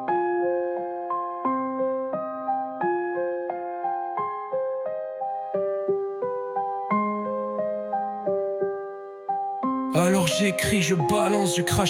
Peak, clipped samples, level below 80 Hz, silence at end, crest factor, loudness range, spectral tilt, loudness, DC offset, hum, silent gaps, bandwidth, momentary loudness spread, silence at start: -8 dBFS; under 0.1%; -56 dBFS; 0 s; 18 dB; 4 LU; -5 dB/octave; -26 LUFS; under 0.1%; none; none; 16 kHz; 8 LU; 0 s